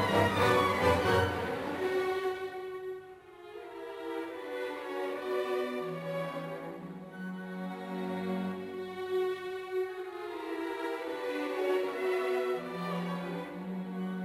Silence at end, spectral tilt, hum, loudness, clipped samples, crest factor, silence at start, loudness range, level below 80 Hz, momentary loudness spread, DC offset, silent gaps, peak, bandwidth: 0 s; -6 dB/octave; none; -34 LUFS; under 0.1%; 20 dB; 0 s; 6 LU; -56 dBFS; 14 LU; under 0.1%; none; -14 dBFS; 16 kHz